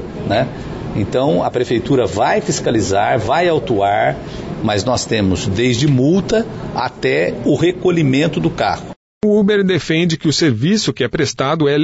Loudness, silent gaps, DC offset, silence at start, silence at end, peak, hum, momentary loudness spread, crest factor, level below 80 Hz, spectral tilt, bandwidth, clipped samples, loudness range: -16 LUFS; 8.96-9.21 s; under 0.1%; 0 s; 0 s; -4 dBFS; none; 7 LU; 12 dB; -40 dBFS; -5.5 dB/octave; 8 kHz; under 0.1%; 1 LU